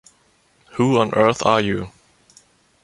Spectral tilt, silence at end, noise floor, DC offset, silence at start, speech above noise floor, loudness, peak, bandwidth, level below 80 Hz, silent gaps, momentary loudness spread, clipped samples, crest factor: -5.5 dB/octave; 0.95 s; -59 dBFS; under 0.1%; 0.75 s; 42 dB; -18 LUFS; -2 dBFS; 11.5 kHz; -52 dBFS; none; 15 LU; under 0.1%; 20 dB